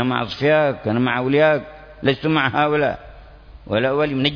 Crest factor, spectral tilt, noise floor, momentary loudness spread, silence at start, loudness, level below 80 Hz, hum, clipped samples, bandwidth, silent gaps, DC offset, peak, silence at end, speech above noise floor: 16 dB; -7.5 dB/octave; -41 dBFS; 7 LU; 0 s; -19 LUFS; -46 dBFS; none; under 0.1%; 5.4 kHz; none; under 0.1%; -2 dBFS; 0 s; 23 dB